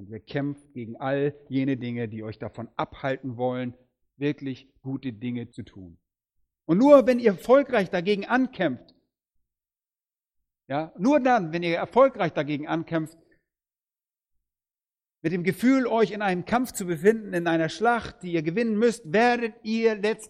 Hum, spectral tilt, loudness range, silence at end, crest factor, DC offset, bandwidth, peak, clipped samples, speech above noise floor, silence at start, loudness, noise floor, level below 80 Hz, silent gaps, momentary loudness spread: none; -6.5 dB/octave; 10 LU; 0 s; 22 dB; under 0.1%; 15.5 kHz; -4 dBFS; under 0.1%; over 66 dB; 0 s; -25 LUFS; under -90 dBFS; -62 dBFS; none; 15 LU